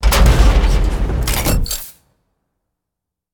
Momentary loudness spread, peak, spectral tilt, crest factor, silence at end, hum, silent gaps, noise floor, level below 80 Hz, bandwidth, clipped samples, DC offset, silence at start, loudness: 11 LU; 0 dBFS; -4.5 dB/octave; 14 dB; 1.45 s; none; none; -81 dBFS; -16 dBFS; over 20 kHz; under 0.1%; under 0.1%; 0 s; -16 LUFS